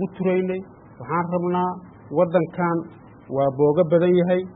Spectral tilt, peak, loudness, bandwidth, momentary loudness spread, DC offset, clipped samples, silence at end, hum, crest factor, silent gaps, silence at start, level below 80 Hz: -12.5 dB/octave; -6 dBFS; -22 LUFS; 4 kHz; 12 LU; under 0.1%; under 0.1%; 0 s; none; 16 dB; none; 0 s; -60 dBFS